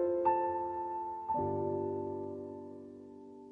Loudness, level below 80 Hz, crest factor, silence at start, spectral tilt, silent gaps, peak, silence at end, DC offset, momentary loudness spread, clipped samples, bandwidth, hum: -36 LUFS; -68 dBFS; 16 dB; 0 s; -10.5 dB/octave; none; -20 dBFS; 0 s; under 0.1%; 20 LU; under 0.1%; 3.7 kHz; none